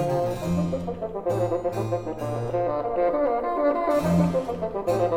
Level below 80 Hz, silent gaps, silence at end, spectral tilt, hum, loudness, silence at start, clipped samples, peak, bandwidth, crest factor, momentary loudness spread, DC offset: -48 dBFS; none; 0 s; -8 dB/octave; none; -25 LUFS; 0 s; under 0.1%; -10 dBFS; 16.5 kHz; 14 dB; 7 LU; under 0.1%